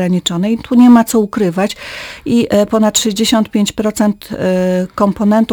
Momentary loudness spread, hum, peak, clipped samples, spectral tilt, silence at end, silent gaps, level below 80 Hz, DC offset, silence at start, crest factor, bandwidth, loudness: 9 LU; none; 0 dBFS; 0.2%; -5 dB/octave; 0 s; none; -44 dBFS; under 0.1%; 0 s; 12 dB; over 20 kHz; -13 LUFS